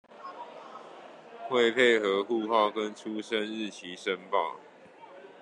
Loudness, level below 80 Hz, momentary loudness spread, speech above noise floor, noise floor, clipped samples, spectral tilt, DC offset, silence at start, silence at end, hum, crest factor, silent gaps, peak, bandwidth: -28 LUFS; -82 dBFS; 25 LU; 23 dB; -51 dBFS; under 0.1%; -4 dB/octave; under 0.1%; 0.1 s; 0.1 s; none; 20 dB; none; -10 dBFS; 10.5 kHz